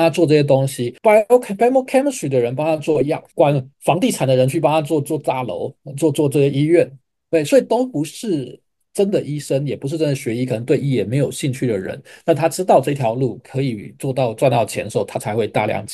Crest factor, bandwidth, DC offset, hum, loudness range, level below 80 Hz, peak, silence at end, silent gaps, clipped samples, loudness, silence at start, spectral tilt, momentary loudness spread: 16 dB; 12.5 kHz; under 0.1%; none; 4 LU; -62 dBFS; -2 dBFS; 0 s; none; under 0.1%; -18 LUFS; 0 s; -6.5 dB/octave; 9 LU